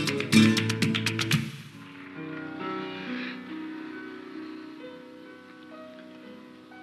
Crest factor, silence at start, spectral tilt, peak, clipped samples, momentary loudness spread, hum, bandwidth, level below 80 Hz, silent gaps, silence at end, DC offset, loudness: 24 dB; 0 s; -4.5 dB/octave; -6 dBFS; under 0.1%; 24 LU; none; 14.5 kHz; -68 dBFS; none; 0 s; under 0.1%; -27 LUFS